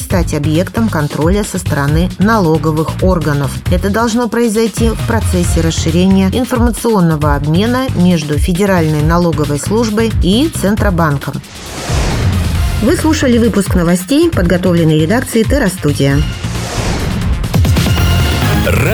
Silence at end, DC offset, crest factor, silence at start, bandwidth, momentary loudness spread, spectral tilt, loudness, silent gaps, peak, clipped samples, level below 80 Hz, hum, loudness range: 0 s; under 0.1%; 12 dB; 0 s; over 20 kHz; 5 LU; -6 dB/octave; -12 LUFS; none; 0 dBFS; under 0.1%; -22 dBFS; none; 2 LU